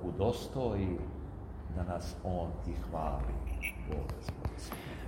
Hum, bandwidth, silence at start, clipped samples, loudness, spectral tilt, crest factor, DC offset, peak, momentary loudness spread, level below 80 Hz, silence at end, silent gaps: none; 16.5 kHz; 0 s; under 0.1%; -38 LUFS; -7 dB/octave; 20 dB; under 0.1%; -18 dBFS; 9 LU; -42 dBFS; 0 s; none